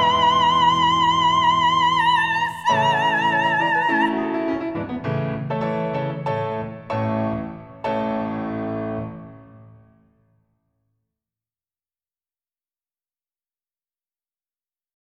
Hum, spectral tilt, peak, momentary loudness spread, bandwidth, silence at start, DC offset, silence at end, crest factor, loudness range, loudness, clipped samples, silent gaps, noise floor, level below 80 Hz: none; -5 dB/octave; -6 dBFS; 11 LU; 11.5 kHz; 0 s; under 0.1%; 5.45 s; 16 dB; 13 LU; -20 LUFS; under 0.1%; none; under -90 dBFS; -54 dBFS